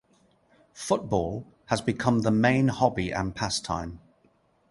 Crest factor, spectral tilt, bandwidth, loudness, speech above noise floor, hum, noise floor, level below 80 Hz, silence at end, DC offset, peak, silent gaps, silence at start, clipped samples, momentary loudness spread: 22 dB; -5.5 dB/octave; 11.5 kHz; -26 LUFS; 39 dB; none; -65 dBFS; -50 dBFS; 0.75 s; under 0.1%; -6 dBFS; none; 0.75 s; under 0.1%; 11 LU